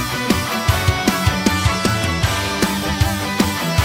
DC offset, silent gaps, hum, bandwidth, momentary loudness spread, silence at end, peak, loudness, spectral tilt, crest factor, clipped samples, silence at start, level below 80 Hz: under 0.1%; none; none; over 20 kHz; 2 LU; 0 s; 0 dBFS; -18 LUFS; -4.5 dB/octave; 18 dB; under 0.1%; 0 s; -30 dBFS